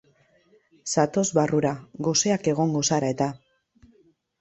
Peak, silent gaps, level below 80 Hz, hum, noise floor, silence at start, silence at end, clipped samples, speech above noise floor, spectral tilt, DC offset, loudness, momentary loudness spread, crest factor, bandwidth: -6 dBFS; none; -62 dBFS; none; -62 dBFS; 0.85 s; 1.05 s; under 0.1%; 38 dB; -4.5 dB/octave; under 0.1%; -24 LUFS; 7 LU; 20 dB; 8.2 kHz